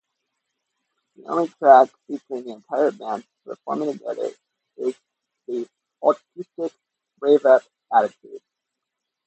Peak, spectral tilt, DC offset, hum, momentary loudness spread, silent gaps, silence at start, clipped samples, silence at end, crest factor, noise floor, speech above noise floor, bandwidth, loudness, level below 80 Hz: 0 dBFS; -6 dB/octave; under 0.1%; none; 18 LU; none; 1.3 s; under 0.1%; 0.9 s; 22 dB; -83 dBFS; 62 dB; 8.4 kHz; -21 LUFS; -80 dBFS